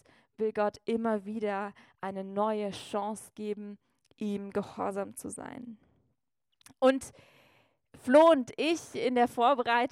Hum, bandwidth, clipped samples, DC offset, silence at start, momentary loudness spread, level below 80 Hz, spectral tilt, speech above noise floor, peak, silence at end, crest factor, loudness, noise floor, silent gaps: none; 15 kHz; under 0.1%; under 0.1%; 0.4 s; 17 LU; -72 dBFS; -5 dB/octave; 53 dB; -10 dBFS; 0.05 s; 22 dB; -30 LUFS; -83 dBFS; none